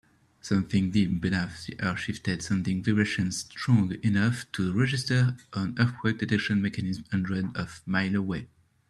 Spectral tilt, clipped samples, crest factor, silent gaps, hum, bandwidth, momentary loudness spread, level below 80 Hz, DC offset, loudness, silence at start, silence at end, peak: -6 dB/octave; under 0.1%; 20 dB; none; none; 12 kHz; 7 LU; -58 dBFS; under 0.1%; -28 LUFS; 0.45 s; 0.45 s; -8 dBFS